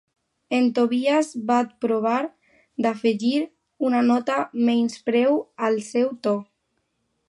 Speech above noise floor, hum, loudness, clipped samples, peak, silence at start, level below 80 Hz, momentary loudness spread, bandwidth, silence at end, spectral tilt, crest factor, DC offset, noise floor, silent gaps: 52 dB; none; -23 LUFS; under 0.1%; -6 dBFS; 0.5 s; -76 dBFS; 6 LU; 11.5 kHz; 0.85 s; -5 dB/octave; 16 dB; under 0.1%; -73 dBFS; none